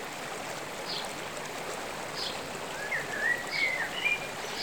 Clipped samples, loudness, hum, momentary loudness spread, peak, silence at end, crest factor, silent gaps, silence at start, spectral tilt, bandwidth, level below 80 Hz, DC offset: under 0.1%; -32 LUFS; none; 8 LU; -16 dBFS; 0 s; 18 dB; none; 0 s; -2 dB/octave; over 20 kHz; -64 dBFS; 0.2%